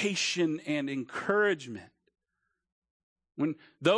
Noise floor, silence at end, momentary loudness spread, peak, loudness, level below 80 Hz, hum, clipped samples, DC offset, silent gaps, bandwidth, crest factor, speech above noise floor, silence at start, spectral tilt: -83 dBFS; 0 s; 14 LU; -12 dBFS; -30 LUFS; -78 dBFS; none; under 0.1%; under 0.1%; 2.72-2.82 s, 2.90-3.16 s; 10.5 kHz; 20 dB; 53 dB; 0 s; -4 dB/octave